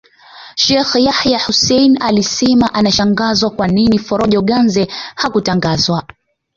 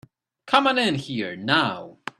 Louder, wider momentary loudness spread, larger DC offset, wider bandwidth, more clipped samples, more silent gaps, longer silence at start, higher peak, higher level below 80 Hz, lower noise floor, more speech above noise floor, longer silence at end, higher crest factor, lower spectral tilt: first, -13 LUFS vs -22 LUFS; second, 5 LU vs 10 LU; neither; second, 7.4 kHz vs 12.5 kHz; neither; neither; about the same, 0.35 s vs 0.45 s; about the same, 0 dBFS vs 0 dBFS; first, -42 dBFS vs -66 dBFS; second, -38 dBFS vs -46 dBFS; about the same, 26 dB vs 23 dB; first, 0.55 s vs 0.25 s; second, 12 dB vs 24 dB; about the same, -4.5 dB/octave vs -4.5 dB/octave